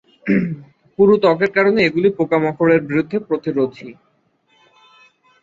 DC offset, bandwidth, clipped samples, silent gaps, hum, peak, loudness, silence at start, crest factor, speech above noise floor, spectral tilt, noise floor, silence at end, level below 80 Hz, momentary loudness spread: under 0.1%; 7.4 kHz; under 0.1%; none; none; -2 dBFS; -17 LUFS; 0.25 s; 16 dB; 45 dB; -8 dB/octave; -61 dBFS; 1.5 s; -56 dBFS; 10 LU